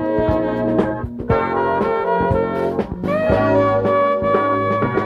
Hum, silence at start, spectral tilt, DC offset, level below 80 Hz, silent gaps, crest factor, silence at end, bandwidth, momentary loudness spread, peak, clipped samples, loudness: none; 0 s; -9 dB/octave; under 0.1%; -36 dBFS; none; 14 dB; 0 s; 7.2 kHz; 6 LU; -4 dBFS; under 0.1%; -18 LUFS